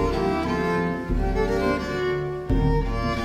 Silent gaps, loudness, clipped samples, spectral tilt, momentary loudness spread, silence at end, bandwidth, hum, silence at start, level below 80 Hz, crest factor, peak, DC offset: none; -25 LUFS; under 0.1%; -7 dB/octave; 3 LU; 0 s; 13 kHz; none; 0 s; -30 dBFS; 14 dB; -10 dBFS; under 0.1%